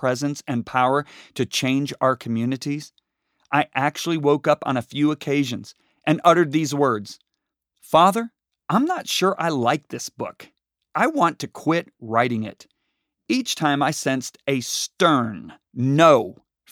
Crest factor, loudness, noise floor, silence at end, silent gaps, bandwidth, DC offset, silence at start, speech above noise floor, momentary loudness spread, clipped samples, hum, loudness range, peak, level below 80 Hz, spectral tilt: 20 dB; -21 LUFS; -81 dBFS; 0.4 s; none; 17.5 kHz; under 0.1%; 0 s; 59 dB; 14 LU; under 0.1%; none; 3 LU; -2 dBFS; -68 dBFS; -5 dB/octave